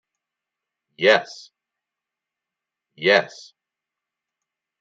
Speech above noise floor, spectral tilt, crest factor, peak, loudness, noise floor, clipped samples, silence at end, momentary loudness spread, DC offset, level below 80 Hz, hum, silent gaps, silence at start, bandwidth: 66 dB; -3.5 dB/octave; 24 dB; -2 dBFS; -19 LUFS; -86 dBFS; under 0.1%; 1.55 s; 18 LU; under 0.1%; -80 dBFS; none; none; 1 s; 7.8 kHz